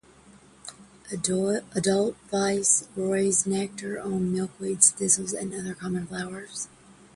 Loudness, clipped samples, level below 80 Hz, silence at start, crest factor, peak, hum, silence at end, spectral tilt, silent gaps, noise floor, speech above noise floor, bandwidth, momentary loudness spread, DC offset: -25 LUFS; under 0.1%; -62 dBFS; 0.3 s; 22 dB; -6 dBFS; none; 0.25 s; -3.5 dB/octave; none; -54 dBFS; 27 dB; 11.5 kHz; 16 LU; under 0.1%